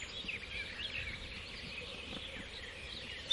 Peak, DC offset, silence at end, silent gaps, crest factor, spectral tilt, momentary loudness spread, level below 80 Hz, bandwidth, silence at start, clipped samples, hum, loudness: -20 dBFS; under 0.1%; 0 s; none; 22 dB; -3 dB/octave; 5 LU; -56 dBFS; 11.5 kHz; 0 s; under 0.1%; none; -42 LUFS